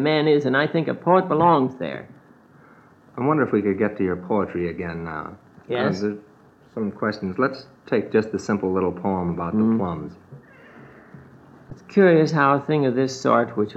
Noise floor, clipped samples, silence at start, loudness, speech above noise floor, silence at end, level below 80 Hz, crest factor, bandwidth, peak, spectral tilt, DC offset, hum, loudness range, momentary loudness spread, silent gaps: -51 dBFS; under 0.1%; 0 s; -22 LUFS; 30 dB; 0 s; -58 dBFS; 18 dB; 8 kHz; -4 dBFS; -7 dB/octave; under 0.1%; none; 5 LU; 14 LU; none